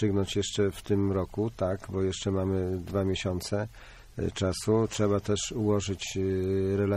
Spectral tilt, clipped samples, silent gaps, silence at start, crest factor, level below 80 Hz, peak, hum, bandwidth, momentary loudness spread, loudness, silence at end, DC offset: -5.5 dB/octave; under 0.1%; none; 0 s; 14 dB; -50 dBFS; -14 dBFS; none; 14.5 kHz; 6 LU; -29 LUFS; 0 s; under 0.1%